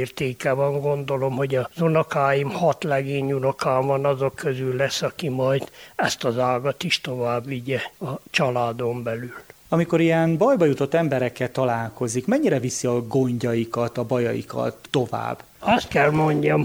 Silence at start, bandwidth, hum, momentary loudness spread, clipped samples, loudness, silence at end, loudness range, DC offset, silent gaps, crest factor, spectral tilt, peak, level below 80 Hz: 0 s; over 20 kHz; none; 8 LU; under 0.1%; -23 LUFS; 0 s; 3 LU; under 0.1%; none; 18 dB; -5.5 dB/octave; -4 dBFS; -56 dBFS